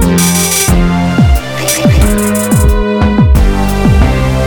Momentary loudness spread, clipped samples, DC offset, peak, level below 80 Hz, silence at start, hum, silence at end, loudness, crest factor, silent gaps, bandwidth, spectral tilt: 3 LU; under 0.1%; under 0.1%; 0 dBFS; -12 dBFS; 0 s; none; 0 s; -9 LUFS; 8 dB; none; 19.5 kHz; -5 dB/octave